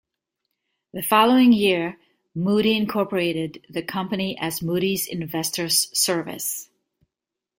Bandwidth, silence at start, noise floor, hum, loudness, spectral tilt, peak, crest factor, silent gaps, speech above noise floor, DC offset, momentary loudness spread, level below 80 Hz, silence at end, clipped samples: 17 kHz; 0.95 s; -87 dBFS; none; -22 LUFS; -3.5 dB/octave; -4 dBFS; 20 dB; none; 65 dB; under 0.1%; 13 LU; -62 dBFS; 0.95 s; under 0.1%